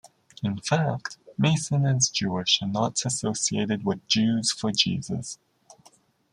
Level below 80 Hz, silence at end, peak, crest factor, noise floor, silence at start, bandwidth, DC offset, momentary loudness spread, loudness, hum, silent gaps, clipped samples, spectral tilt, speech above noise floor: -64 dBFS; 0.95 s; -6 dBFS; 20 dB; -59 dBFS; 0.4 s; 11.5 kHz; under 0.1%; 10 LU; -25 LUFS; none; none; under 0.1%; -4 dB/octave; 34 dB